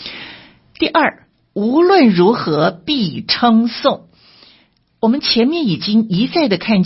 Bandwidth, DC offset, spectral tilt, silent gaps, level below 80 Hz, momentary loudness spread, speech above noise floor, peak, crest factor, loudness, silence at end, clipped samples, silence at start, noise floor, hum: 5.8 kHz; under 0.1%; -8.5 dB/octave; none; -54 dBFS; 10 LU; 41 dB; 0 dBFS; 16 dB; -14 LUFS; 0 s; under 0.1%; 0 s; -55 dBFS; none